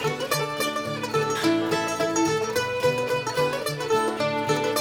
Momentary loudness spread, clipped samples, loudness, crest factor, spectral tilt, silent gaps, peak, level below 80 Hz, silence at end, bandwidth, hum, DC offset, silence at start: 3 LU; under 0.1%; -25 LUFS; 14 dB; -4 dB/octave; none; -10 dBFS; -60 dBFS; 0 s; over 20 kHz; none; under 0.1%; 0 s